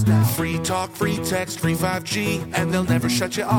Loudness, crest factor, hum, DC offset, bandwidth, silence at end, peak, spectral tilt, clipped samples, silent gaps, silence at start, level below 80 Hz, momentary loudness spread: -22 LUFS; 16 dB; none; under 0.1%; 18.5 kHz; 0 s; -6 dBFS; -5 dB/octave; under 0.1%; none; 0 s; -50 dBFS; 4 LU